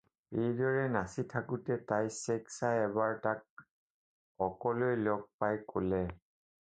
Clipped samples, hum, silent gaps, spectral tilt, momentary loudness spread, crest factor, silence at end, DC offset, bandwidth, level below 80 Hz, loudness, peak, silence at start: under 0.1%; none; 3.50-3.57 s, 3.71-4.35 s, 5.34-5.39 s; -6.5 dB/octave; 6 LU; 20 dB; 0.45 s; under 0.1%; 9 kHz; -62 dBFS; -35 LUFS; -16 dBFS; 0.3 s